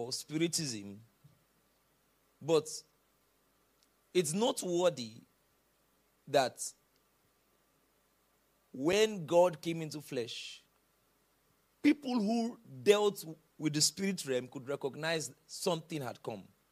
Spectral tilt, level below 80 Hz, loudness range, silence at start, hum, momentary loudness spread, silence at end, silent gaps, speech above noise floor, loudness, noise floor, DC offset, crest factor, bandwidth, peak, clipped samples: -4 dB/octave; -78 dBFS; 8 LU; 0 s; none; 16 LU; 0.3 s; none; 40 dB; -33 LUFS; -73 dBFS; under 0.1%; 24 dB; 15.5 kHz; -12 dBFS; under 0.1%